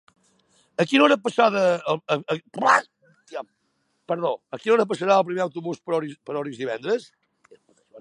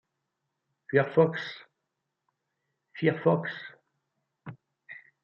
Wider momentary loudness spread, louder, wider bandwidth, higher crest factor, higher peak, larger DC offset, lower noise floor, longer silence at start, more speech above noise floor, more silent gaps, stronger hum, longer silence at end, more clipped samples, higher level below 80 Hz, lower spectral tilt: second, 13 LU vs 23 LU; first, -23 LUFS vs -27 LUFS; first, 11.5 kHz vs 6.8 kHz; about the same, 22 dB vs 22 dB; first, -2 dBFS vs -8 dBFS; neither; second, -71 dBFS vs -84 dBFS; about the same, 0.8 s vs 0.9 s; second, 49 dB vs 57 dB; neither; neither; second, 0 s vs 0.25 s; neither; about the same, -78 dBFS vs -76 dBFS; second, -5 dB/octave vs -8.5 dB/octave